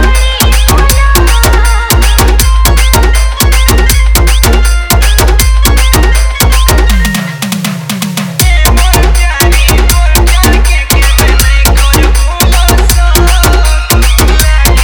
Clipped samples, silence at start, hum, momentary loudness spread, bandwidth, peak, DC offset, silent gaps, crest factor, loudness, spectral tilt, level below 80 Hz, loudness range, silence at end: 0.8%; 0 s; none; 3 LU; over 20 kHz; 0 dBFS; under 0.1%; none; 6 dB; -7 LUFS; -3.5 dB/octave; -6 dBFS; 2 LU; 0 s